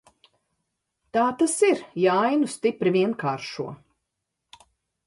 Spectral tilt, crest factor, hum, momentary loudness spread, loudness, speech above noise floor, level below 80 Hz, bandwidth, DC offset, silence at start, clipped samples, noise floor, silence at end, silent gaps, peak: -5 dB/octave; 16 dB; none; 11 LU; -23 LUFS; 58 dB; -70 dBFS; 11.5 kHz; under 0.1%; 1.15 s; under 0.1%; -81 dBFS; 1.3 s; none; -8 dBFS